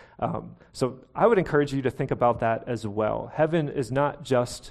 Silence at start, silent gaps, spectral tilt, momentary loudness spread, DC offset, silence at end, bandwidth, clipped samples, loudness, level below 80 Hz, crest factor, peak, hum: 0 s; none; -6.5 dB/octave; 9 LU; under 0.1%; 0 s; 13 kHz; under 0.1%; -26 LUFS; -52 dBFS; 18 dB; -8 dBFS; none